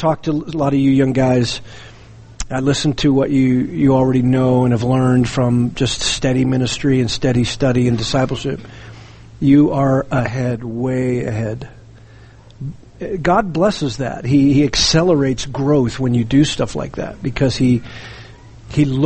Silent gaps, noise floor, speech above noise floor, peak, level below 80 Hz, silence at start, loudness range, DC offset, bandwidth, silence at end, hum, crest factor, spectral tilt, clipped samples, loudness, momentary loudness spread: none; -41 dBFS; 26 dB; -2 dBFS; -36 dBFS; 0 s; 5 LU; under 0.1%; 8.8 kHz; 0 s; none; 14 dB; -6 dB/octave; under 0.1%; -16 LUFS; 12 LU